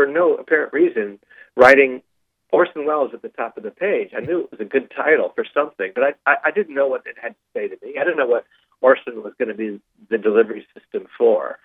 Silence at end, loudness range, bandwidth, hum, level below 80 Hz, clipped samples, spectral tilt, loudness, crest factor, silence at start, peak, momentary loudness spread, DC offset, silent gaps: 0.1 s; 4 LU; 9 kHz; none; -66 dBFS; under 0.1%; -6 dB/octave; -19 LUFS; 20 dB; 0 s; 0 dBFS; 13 LU; under 0.1%; none